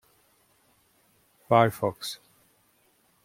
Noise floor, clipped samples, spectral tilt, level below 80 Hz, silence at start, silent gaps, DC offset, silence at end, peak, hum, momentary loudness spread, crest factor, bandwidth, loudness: -66 dBFS; under 0.1%; -5.5 dB/octave; -70 dBFS; 1.5 s; none; under 0.1%; 1.1 s; -6 dBFS; none; 16 LU; 24 dB; 16.5 kHz; -25 LUFS